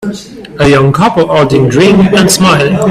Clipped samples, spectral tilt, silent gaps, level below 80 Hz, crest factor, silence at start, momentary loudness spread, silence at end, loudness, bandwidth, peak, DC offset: 0.2%; -5 dB/octave; none; -36 dBFS; 8 dB; 0 s; 10 LU; 0 s; -7 LUFS; 15.5 kHz; 0 dBFS; under 0.1%